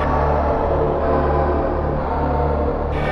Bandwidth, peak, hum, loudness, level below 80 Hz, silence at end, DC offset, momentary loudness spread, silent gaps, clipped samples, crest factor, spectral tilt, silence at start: 5.8 kHz; -6 dBFS; none; -19 LUFS; -24 dBFS; 0 s; 0.1%; 3 LU; none; under 0.1%; 12 dB; -9.5 dB/octave; 0 s